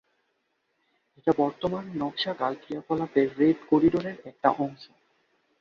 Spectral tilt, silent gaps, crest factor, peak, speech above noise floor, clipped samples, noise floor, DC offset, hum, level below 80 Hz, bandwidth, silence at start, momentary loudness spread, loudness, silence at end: -7.5 dB/octave; none; 22 dB; -6 dBFS; 49 dB; under 0.1%; -75 dBFS; under 0.1%; none; -62 dBFS; 6.8 kHz; 1.25 s; 9 LU; -27 LUFS; 0.75 s